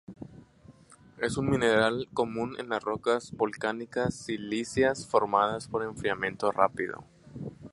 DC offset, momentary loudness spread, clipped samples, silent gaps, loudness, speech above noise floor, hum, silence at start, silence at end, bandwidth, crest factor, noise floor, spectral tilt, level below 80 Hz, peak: under 0.1%; 17 LU; under 0.1%; none; -29 LUFS; 27 dB; none; 0.1 s; 0.05 s; 11.5 kHz; 24 dB; -55 dBFS; -5 dB/octave; -58 dBFS; -6 dBFS